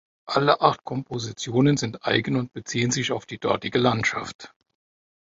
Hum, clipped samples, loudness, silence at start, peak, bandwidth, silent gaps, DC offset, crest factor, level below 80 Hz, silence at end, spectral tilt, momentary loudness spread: none; under 0.1%; -24 LUFS; 0.25 s; -2 dBFS; 8 kHz; 4.35-4.39 s; under 0.1%; 22 dB; -58 dBFS; 0.85 s; -4.5 dB/octave; 10 LU